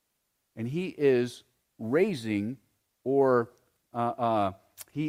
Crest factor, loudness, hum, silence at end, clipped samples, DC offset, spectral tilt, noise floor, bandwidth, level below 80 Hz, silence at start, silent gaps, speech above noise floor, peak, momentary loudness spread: 18 dB; -28 LUFS; none; 0 s; under 0.1%; under 0.1%; -7 dB/octave; -78 dBFS; 16 kHz; -72 dBFS; 0.55 s; none; 51 dB; -12 dBFS; 15 LU